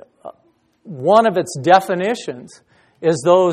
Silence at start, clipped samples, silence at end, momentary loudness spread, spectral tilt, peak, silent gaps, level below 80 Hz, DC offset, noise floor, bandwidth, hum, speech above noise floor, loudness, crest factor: 0.25 s; under 0.1%; 0 s; 16 LU; -5.5 dB/octave; 0 dBFS; none; -62 dBFS; under 0.1%; -59 dBFS; 14.5 kHz; none; 44 dB; -16 LUFS; 18 dB